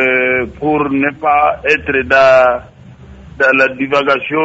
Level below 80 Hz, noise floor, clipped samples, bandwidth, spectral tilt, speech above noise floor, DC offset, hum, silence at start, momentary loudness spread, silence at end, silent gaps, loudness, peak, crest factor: -40 dBFS; -36 dBFS; under 0.1%; 8 kHz; -5.5 dB/octave; 24 dB; under 0.1%; none; 0 s; 7 LU; 0 s; none; -12 LUFS; 0 dBFS; 12 dB